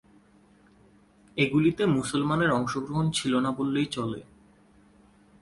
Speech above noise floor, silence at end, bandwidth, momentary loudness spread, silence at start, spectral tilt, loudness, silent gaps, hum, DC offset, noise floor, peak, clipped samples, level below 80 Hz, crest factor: 33 dB; 1.2 s; 11.5 kHz; 9 LU; 1.35 s; -5.5 dB/octave; -26 LUFS; none; none; under 0.1%; -59 dBFS; -10 dBFS; under 0.1%; -58 dBFS; 18 dB